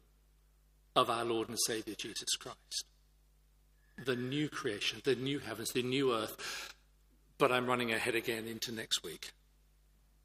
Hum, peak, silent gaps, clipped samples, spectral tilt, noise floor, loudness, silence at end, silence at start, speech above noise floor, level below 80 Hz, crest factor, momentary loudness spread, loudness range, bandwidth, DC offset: none; -12 dBFS; none; under 0.1%; -3 dB/octave; -67 dBFS; -35 LUFS; 0.95 s; 0.95 s; 32 dB; -68 dBFS; 26 dB; 10 LU; 4 LU; 15.5 kHz; under 0.1%